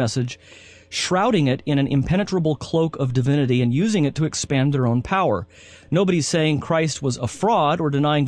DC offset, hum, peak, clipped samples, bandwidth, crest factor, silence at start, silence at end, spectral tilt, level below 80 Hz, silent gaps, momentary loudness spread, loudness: under 0.1%; none; -6 dBFS; under 0.1%; 11 kHz; 14 dB; 0 s; 0 s; -6 dB/octave; -46 dBFS; none; 6 LU; -21 LUFS